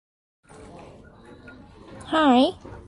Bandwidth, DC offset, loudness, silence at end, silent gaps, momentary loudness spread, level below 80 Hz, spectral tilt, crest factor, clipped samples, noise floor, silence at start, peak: 11 kHz; under 0.1%; -20 LUFS; 0.1 s; none; 27 LU; -54 dBFS; -5 dB/octave; 20 dB; under 0.1%; -47 dBFS; 1.9 s; -6 dBFS